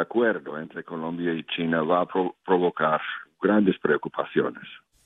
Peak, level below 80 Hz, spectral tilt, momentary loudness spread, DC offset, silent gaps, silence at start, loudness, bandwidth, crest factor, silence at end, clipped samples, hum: -8 dBFS; -70 dBFS; -8.5 dB/octave; 13 LU; under 0.1%; none; 0 s; -25 LUFS; 4 kHz; 18 dB; 0.3 s; under 0.1%; none